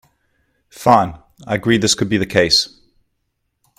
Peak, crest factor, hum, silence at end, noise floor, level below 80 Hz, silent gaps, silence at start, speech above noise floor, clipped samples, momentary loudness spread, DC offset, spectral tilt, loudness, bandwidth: 0 dBFS; 18 dB; none; 1.1 s; -71 dBFS; -48 dBFS; none; 0.8 s; 56 dB; under 0.1%; 11 LU; under 0.1%; -3.5 dB/octave; -16 LUFS; 15.5 kHz